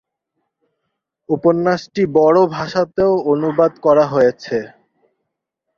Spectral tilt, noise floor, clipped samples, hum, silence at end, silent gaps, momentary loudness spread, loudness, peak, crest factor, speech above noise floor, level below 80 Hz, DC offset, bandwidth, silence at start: -7 dB/octave; -77 dBFS; under 0.1%; none; 1.1 s; none; 11 LU; -16 LUFS; -2 dBFS; 16 dB; 62 dB; -56 dBFS; under 0.1%; 7 kHz; 1.3 s